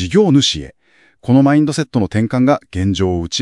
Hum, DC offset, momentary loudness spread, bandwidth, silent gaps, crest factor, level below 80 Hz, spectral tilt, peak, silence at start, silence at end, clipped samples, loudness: none; under 0.1%; 7 LU; 11.5 kHz; none; 14 dB; -44 dBFS; -5.5 dB/octave; 0 dBFS; 0 s; 0 s; under 0.1%; -15 LUFS